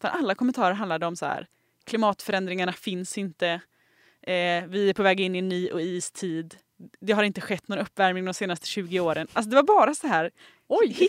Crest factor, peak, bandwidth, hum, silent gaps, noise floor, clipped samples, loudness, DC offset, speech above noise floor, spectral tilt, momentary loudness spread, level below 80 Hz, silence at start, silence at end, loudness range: 20 dB; -6 dBFS; 16 kHz; none; none; -63 dBFS; under 0.1%; -26 LUFS; under 0.1%; 37 dB; -4.5 dB/octave; 10 LU; -72 dBFS; 0.05 s; 0 s; 4 LU